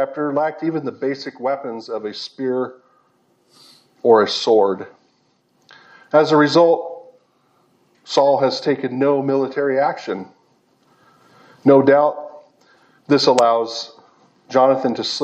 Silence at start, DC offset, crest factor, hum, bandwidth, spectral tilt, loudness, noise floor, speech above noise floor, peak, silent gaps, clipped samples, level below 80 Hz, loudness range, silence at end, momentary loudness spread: 0 s; under 0.1%; 20 dB; none; 8.6 kHz; -5 dB/octave; -18 LUFS; -62 dBFS; 45 dB; 0 dBFS; none; under 0.1%; -74 dBFS; 5 LU; 0 s; 15 LU